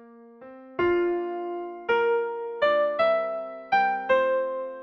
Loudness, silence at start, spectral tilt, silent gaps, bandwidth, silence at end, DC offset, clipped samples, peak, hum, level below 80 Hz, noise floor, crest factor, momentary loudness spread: -25 LUFS; 0 s; -6 dB/octave; none; 6 kHz; 0 s; under 0.1%; under 0.1%; -12 dBFS; none; -62 dBFS; -47 dBFS; 14 dB; 10 LU